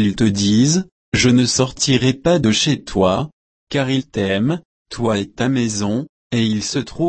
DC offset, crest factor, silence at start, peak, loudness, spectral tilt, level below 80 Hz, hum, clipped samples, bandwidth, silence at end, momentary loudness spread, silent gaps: under 0.1%; 16 dB; 0 s; -2 dBFS; -18 LUFS; -4.5 dB/octave; -44 dBFS; none; under 0.1%; 8.8 kHz; 0 s; 9 LU; 0.92-1.12 s, 3.33-3.67 s, 4.65-4.85 s, 6.09-6.30 s